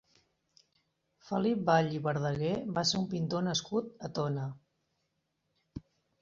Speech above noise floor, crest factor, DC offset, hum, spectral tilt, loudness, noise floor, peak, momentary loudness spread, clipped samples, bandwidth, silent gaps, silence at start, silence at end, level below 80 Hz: 49 dB; 22 dB; under 0.1%; none; -5 dB/octave; -32 LUFS; -81 dBFS; -12 dBFS; 16 LU; under 0.1%; 7.8 kHz; none; 1.25 s; 0.4 s; -66 dBFS